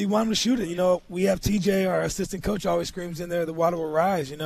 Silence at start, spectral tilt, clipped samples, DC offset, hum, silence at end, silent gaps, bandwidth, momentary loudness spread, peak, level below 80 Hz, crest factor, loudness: 0 s; -5 dB/octave; under 0.1%; under 0.1%; none; 0 s; none; 14 kHz; 6 LU; -10 dBFS; -44 dBFS; 16 dB; -25 LUFS